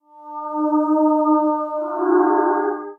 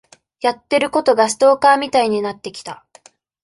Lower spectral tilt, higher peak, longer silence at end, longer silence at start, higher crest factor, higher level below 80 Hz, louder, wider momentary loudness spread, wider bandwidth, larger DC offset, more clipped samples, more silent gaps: first, -7.5 dB/octave vs -3 dB/octave; second, -6 dBFS vs -2 dBFS; second, 0.05 s vs 0.7 s; second, 0.15 s vs 0.4 s; about the same, 14 dB vs 16 dB; second, -88 dBFS vs -60 dBFS; second, -19 LUFS vs -16 LUFS; second, 10 LU vs 18 LU; second, 2.2 kHz vs 11.5 kHz; neither; neither; neither